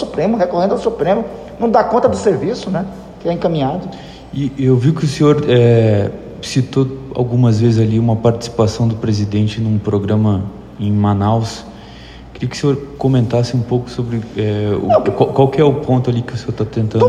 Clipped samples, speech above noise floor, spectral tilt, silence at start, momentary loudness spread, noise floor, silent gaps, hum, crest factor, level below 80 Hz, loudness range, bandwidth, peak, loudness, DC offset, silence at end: under 0.1%; 20 dB; -7.5 dB/octave; 0 s; 12 LU; -35 dBFS; none; none; 14 dB; -42 dBFS; 4 LU; 9.8 kHz; 0 dBFS; -15 LUFS; under 0.1%; 0 s